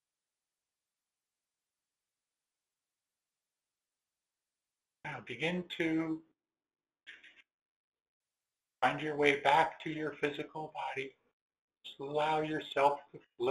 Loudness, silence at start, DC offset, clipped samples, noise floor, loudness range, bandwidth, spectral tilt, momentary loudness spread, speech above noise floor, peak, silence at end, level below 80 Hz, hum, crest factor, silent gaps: -34 LUFS; 5.05 s; under 0.1%; under 0.1%; under -90 dBFS; 8 LU; 12 kHz; -5.5 dB/octave; 17 LU; over 56 dB; -12 dBFS; 0 s; -78 dBFS; none; 26 dB; 7.54-7.92 s, 8.02-8.21 s, 11.33-11.50 s, 11.61-11.68 s